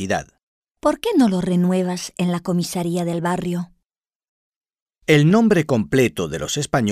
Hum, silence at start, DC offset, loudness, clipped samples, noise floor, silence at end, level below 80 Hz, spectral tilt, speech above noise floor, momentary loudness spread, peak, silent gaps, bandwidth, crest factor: none; 0 s; under 0.1%; -20 LUFS; under 0.1%; -81 dBFS; 0 s; -50 dBFS; -6 dB/octave; 62 dB; 10 LU; -2 dBFS; 0.43-0.62 s, 4.15-4.20 s, 4.28-4.61 s, 4.82-4.86 s; 15.5 kHz; 16 dB